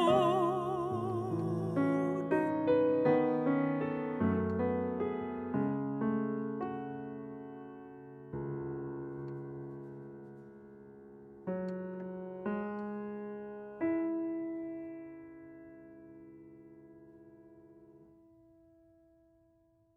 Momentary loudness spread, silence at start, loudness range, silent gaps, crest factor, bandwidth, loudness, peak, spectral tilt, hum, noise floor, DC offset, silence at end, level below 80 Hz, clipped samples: 24 LU; 0 s; 13 LU; none; 20 dB; 12 kHz; -35 LUFS; -16 dBFS; -8.5 dB/octave; none; -69 dBFS; under 0.1%; 1.9 s; -68 dBFS; under 0.1%